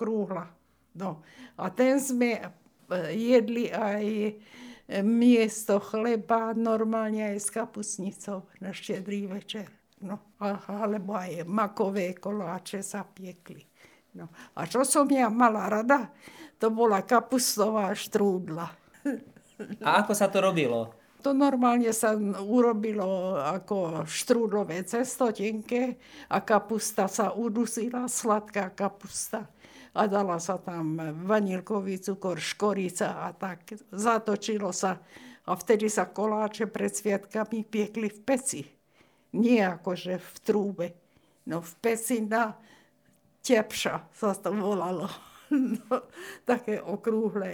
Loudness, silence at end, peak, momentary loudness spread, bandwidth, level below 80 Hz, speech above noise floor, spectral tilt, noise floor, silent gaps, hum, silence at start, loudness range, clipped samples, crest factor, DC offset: -28 LUFS; 0 s; -8 dBFS; 15 LU; over 20 kHz; -74 dBFS; 38 dB; -4.5 dB/octave; -66 dBFS; none; none; 0 s; 6 LU; under 0.1%; 20 dB; under 0.1%